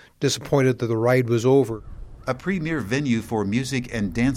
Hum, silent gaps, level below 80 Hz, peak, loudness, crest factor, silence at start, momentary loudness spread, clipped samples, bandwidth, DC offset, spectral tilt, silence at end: none; none; -44 dBFS; -6 dBFS; -22 LUFS; 16 dB; 0.2 s; 9 LU; under 0.1%; 16 kHz; under 0.1%; -6 dB/octave; 0 s